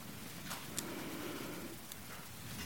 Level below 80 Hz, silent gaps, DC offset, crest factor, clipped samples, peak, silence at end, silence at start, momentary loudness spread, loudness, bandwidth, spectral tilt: -66 dBFS; none; 0.2%; 26 dB; under 0.1%; -20 dBFS; 0 s; 0 s; 6 LU; -45 LUFS; 17 kHz; -3 dB/octave